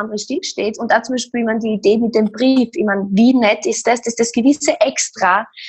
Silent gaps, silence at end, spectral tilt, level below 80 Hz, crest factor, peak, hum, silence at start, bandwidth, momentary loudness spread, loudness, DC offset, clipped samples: none; 0 s; -4 dB/octave; -60 dBFS; 14 dB; 0 dBFS; none; 0 s; 9 kHz; 8 LU; -16 LUFS; under 0.1%; under 0.1%